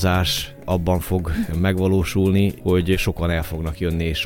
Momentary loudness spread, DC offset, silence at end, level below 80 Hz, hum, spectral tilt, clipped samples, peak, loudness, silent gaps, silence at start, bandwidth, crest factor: 6 LU; under 0.1%; 0 s; -32 dBFS; none; -6 dB/octave; under 0.1%; -6 dBFS; -21 LUFS; none; 0 s; 17 kHz; 14 dB